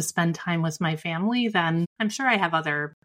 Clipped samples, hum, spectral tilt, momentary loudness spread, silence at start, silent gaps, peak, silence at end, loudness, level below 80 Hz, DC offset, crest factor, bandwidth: under 0.1%; none; -4.5 dB/octave; 5 LU; 0 s; 1.86-1.96 s; -6 dBFS; 0.15 s; -25 LUFS; -70 dBFS; under 0.1%; 18 dB; 16 kHz